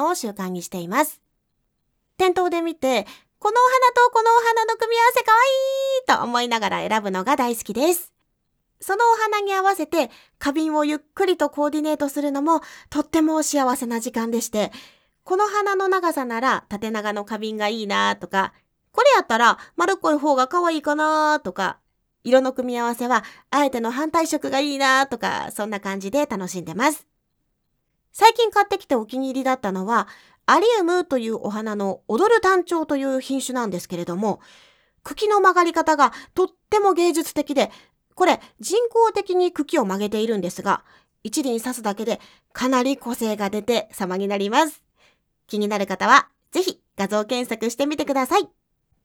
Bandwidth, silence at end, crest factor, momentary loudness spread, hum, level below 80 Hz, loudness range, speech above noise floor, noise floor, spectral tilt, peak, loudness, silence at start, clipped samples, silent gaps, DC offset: 19.5 kHz; 0.6 s; 22 dB; 11 LU; none; -62 dBFS; 5 LU; 52 dB; -72 dBFS; -3.5 dB/octave; 0 dBFS; -21 LUFS; 0 s; under 0.1%; none; under 0.1%